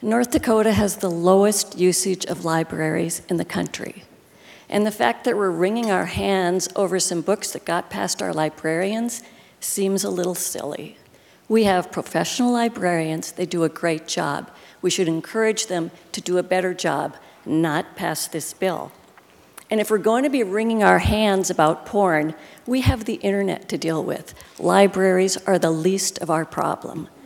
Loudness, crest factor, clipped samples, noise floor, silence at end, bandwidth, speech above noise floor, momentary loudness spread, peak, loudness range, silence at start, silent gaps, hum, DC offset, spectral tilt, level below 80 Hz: -21 LUFS; 22 dB; under 0.1%; -51 dBFS; 0.2 s; 18 kHz; 30 dB; 9 LU; 0 dBFS; 4 LU; 0 s; none; none; under 0.1%; -4.5 dB/octave; -46 dBFS